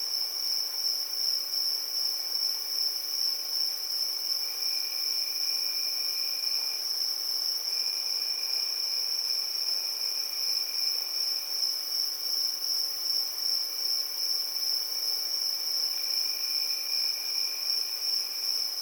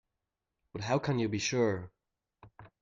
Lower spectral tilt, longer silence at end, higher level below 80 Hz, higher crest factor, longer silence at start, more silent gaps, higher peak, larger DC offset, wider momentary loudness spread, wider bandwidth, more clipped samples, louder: second, 4.5 dB/octave vs -5 dB/octave; second, 0 s vs 0.15 s; second, under -90 dBFS vs -66 dBFS; about the same, 14 dB vs 18 dB; second, 0 s vs 0.75 s; neither; about the same, -16 dBFS vs -18 dBFS; neither; second, 1 LU vs 15 LU; first, over 20 kHz vs 7.6 kHz; neither; first, -27 LUFS vs -32 LUFS